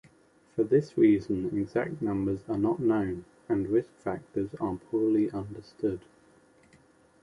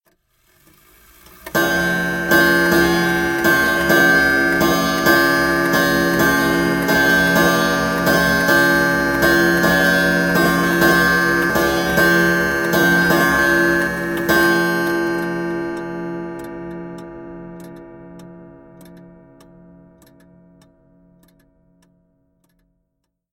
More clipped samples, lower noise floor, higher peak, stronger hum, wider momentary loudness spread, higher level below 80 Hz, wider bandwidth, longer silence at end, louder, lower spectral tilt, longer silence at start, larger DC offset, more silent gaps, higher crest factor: neither; second, -62 dBFS vs -73 dBFS; second, -12 dBFS vs 0 dBFS; neither; about the same, 12 LU vs 14 LU; second, -58 dBFS vs -40 dBFS; second, 10.5 kHz vs 17 kHz; second, 1.25 s vs 4.85 s; second, -29 LUFS vs -15 LUFS; first, -9 dB/octave vs -4.5 dB/octave; second, 0.55 s vs 1.45 s; neither; neither; about the same, 18 dB vs 16 dB